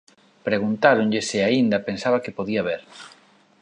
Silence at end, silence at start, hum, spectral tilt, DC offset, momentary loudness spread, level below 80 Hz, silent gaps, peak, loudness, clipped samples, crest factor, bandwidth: 0.55 s; 0.45 s; none; -5 dB/octave; under 0.1%; 14 LU; -62 dBFS; none; -2 dBFS; -22 LUFS; under 0.1%; 20 dB; 10.5 kHz